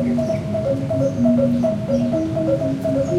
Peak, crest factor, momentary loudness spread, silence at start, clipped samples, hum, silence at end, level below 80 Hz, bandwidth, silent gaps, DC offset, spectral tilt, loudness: -6 dBFS; 12 dB; 4 LU; 0 s; under 0.1%; none; 0 s; -44 dBFS; 11.5 kHz; none; under 0.1%; -8.5 dB/octave; -20 LUFS